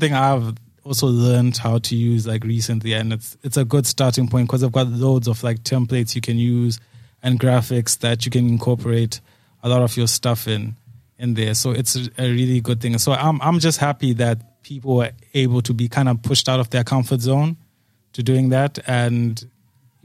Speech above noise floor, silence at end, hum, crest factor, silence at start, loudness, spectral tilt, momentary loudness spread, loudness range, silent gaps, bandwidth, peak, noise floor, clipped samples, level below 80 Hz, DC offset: 43 dB; 0.6 s; none; 16 dB; 0 s; -19 LUFS; -5.5 dB/octave; 8 LU; 1 LU; none; 15.5 kHz; -2 dBFS; -61 dBFS; under 0.1%; -56 dBFS; under 0.1%